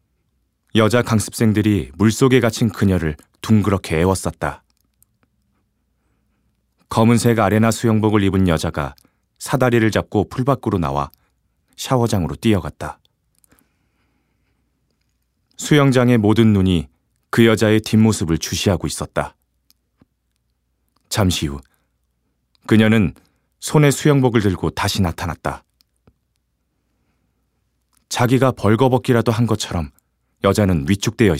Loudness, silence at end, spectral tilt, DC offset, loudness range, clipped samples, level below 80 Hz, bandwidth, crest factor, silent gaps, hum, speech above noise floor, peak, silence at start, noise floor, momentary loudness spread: -17 LUFS; 0 s; -6 dB/octave; under 0.1%; 9 LU; under 0.1%; -42 dBFS; 16 kHz; 18 dB; none; none; 53 dB; 0 dBFS; 0.75 s; -69 dBFS; 13 LU